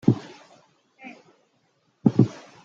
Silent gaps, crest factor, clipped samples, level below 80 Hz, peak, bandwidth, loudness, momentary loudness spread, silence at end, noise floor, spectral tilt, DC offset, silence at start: none; 24 dB; under 0.1%; -64 dBFS; -4 dBFS; 7.4 kHz; -23 LUFS; 25 LU; 0.35 s; -68 dBFS; -9 dB/octave; under 0.1%; 0.05 s